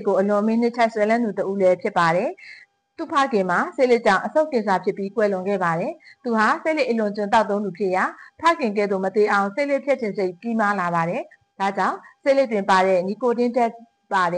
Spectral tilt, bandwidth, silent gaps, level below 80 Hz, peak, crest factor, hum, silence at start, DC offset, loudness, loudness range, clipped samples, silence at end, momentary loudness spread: -6 dB/octave; 10 kHz; none; -68 dBFS; -8 dBFS; 14 dB; none; 0 s; under 0.1%; -21 LUFS; 1 LU; under 0.1%; 0 s; 7 LU